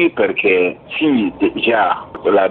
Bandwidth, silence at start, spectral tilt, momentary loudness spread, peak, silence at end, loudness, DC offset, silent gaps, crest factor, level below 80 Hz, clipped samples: 4.4 kHz; 0 s; -2.5 dB/octave; 5 LU; -2 dBFS; 0 s; -16 LUFS; under 0.1%; none; 14 dB; -50 dBFS; under 0.1%